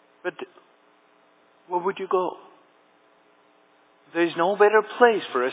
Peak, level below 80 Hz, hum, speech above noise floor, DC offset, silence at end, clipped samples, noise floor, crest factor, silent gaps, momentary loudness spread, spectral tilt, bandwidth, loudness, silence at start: -4 dBFS; under -90 dBFS; none; 37 dB; under 0.1%; 0 s; under 0.1%; -59 dBFS; 22 dB; none; 17 LU; -8.5 dB/octave; 4 kHz; -23 LUFS; 0.25 s